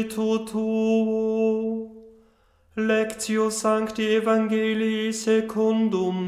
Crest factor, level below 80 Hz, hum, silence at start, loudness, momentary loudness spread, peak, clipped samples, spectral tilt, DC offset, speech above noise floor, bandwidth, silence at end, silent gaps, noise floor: 14 dB; -62 dBFS; none; 0 s; -23 LUFS; 5 LU; -10 dBFS; under 0.1%; -5 dB/octave; under 0.1%; 37 dB; 14.5 kHz; 0 s; none; -60 dBFS